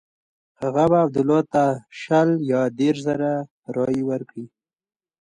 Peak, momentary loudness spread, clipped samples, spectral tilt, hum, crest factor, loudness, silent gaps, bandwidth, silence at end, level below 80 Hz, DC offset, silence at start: -6 dBFS; 11 LU; under 0.1%; -7.5 dB/octave; none; 16 dB; -21 LUFS; 3.51-3.63 s; 10.5 kHz; 0.75 s; -60 dBFS; under 0.1%; 0.6 s